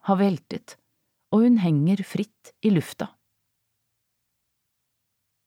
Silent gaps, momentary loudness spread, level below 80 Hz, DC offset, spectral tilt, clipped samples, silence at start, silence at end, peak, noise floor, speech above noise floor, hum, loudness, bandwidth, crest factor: none; 17 LU; -72 dBFS; under 0.1%; -8 dB/octave; under 0.1%; 0.05 s; 2.4 s; -8 dBFS; -77 dBFS; 55 dB; none; -23 LUFS; 16 kHz; 16 dB